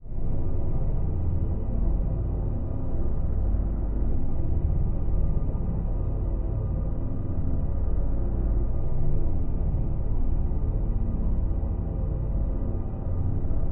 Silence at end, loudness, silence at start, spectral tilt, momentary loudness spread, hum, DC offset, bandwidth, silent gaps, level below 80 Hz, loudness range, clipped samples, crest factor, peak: 0 s; -30 LUFS; 0 s; -14 dB/octave; 2 LU; none; under 0.1%; 2 kHz; none; -26 dBFS; 1 LU; under 0.1%; 10 dB; -12 dBFS